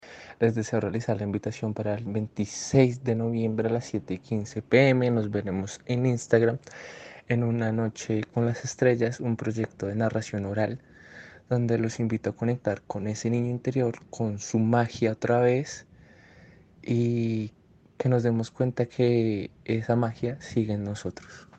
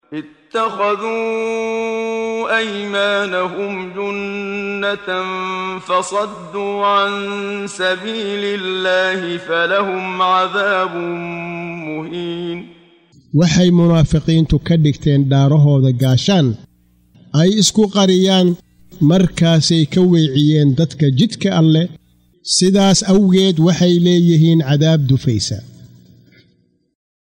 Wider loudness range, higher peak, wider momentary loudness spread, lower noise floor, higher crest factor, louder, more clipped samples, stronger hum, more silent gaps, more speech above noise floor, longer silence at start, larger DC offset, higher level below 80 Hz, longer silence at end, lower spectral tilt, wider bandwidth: about the same, 4 LU vs 6 LU; second, -6 dBFS vs -2 dBFS; about the same, 10 LU vs 12 LU; second, -53 dBFS vs -58 dBFS; first, 20 dB vs 12 dB; second, -27 LUFS vs -15 LUFS; neither; neither; neither; second, 27 dB vs 44 dB; about the same, 0.05 s vs 0.1 s; neither; second, -60 dBFS vs -40 dBFS; second, 0.15 s vs 1.5 s; first, -7 dB/octave vs -5.5 dB/octave; second, 8.6 kHz vs 16 kHz